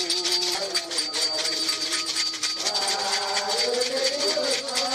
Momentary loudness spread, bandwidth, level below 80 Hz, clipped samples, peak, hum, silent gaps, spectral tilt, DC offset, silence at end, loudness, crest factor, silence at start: 2 LU; 16 kHz; -72 dBFS; under 0.1%; -6 dBFS; none; none; 0.5 dB/octave; under 0.1%; 0 s; -23 LUFS; 18 dB; 0 s